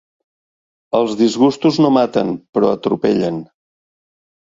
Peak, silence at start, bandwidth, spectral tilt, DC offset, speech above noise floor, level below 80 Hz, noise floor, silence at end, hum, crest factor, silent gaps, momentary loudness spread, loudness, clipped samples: 0 dBFS; 0.95 s; 7.8 kHz; -6.5 dB/octave; under 0.1%; over 75 dB; -58 dBFS; under -90 dBFS; 1.15 s; none; 16 dB; 2.49-2.53 s; 7 LU; -16 LUFS; under 0.1%